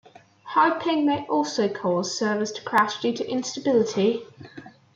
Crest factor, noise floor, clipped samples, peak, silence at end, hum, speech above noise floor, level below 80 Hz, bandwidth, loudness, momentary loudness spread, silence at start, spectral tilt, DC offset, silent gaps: 16 dB; -44 dBFS; under 0.1%; -8 dBFS; 0.25 s; none; 20 dB; -72 dBFS; 16 kHz; -24 LUFS; 7 LU; 0.45 s; -4.5 dB/octave; under 0.1%; none